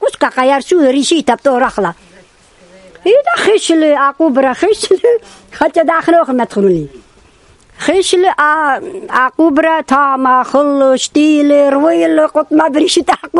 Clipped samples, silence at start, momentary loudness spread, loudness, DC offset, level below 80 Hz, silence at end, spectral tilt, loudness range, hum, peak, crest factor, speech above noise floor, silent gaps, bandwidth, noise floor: 0.1%; 0 s; 5 LU; -11 LUFS; under 0.1%; -50 dBFS; 0 s; -4 dB/octave; 3 LU; none; 0 dBFS; 12 dB; 35 dB; none; 11.5 kHz; -45 dBFS